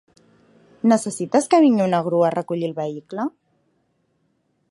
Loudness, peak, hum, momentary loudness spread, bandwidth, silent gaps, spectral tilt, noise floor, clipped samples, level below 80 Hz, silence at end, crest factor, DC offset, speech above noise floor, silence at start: -20 LUFS; -4 dBFS; none; 13 LU; 11.5 kHz; none; -6 dB/octave; -68 dBFS; under 0.1%; -70 dBFS; 1.4 s; 18 dB; under 0.1%; 49 dB; 0.85 s